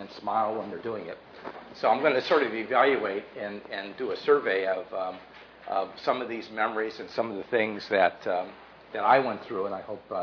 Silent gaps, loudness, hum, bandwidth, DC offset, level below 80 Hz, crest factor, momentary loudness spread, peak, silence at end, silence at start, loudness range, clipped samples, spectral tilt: none; -28 LUFS; none; 5.4 kHz; under 0.1%; -70 dBFS; 20 dB; 14 LU; -8 dBFS; 0 s; 0 s; 4 LU; under 0.1%; -5.5 dB/octave